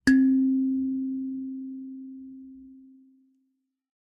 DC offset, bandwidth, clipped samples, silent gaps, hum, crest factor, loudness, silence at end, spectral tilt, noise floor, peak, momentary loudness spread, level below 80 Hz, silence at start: under 0.1%; 11 kHz; under 0.1%; none; none; 22 dB; -26 LUFS; 1.2 s; -5 dB/octave; -76 dBFS; -6 dBFS; 25 LU; -60 dBFS; 0.05 s